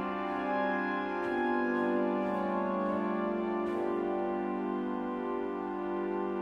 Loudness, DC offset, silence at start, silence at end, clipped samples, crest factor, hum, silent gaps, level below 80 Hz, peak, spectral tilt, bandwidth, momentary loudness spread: -33 LUFS; under 0.1%; 0 s; 0 s; under 0.1%; 12 dB; 50 Hz at -65 dBFS; none; -64 dBFS; -20 dBFS; -8 dB/octave; 6.2 kHz; 5 LU